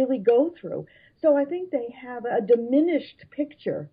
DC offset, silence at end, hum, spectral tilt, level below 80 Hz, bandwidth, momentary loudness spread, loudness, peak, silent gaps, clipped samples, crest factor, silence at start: under 0.1%; 0.05 s; none; -10.5 dB/octave; -72 dBFS; 5 kHz; 14 LU; -24 LUFS; -8 dBFS; none; under 0.1%; 16 dB; 0 s